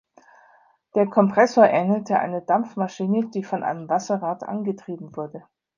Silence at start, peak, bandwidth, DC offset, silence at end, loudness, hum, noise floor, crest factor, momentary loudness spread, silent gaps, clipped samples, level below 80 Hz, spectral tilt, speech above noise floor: 0.95 s; -2 dBFS; 7.4 kHz; under 0.1%; 0.35 s; -22 LUFS; none; -57 dBFS; 20 dB; 16 LU; none; under 0.1%; -72 dBFS; -7 dB/octave; 36 dB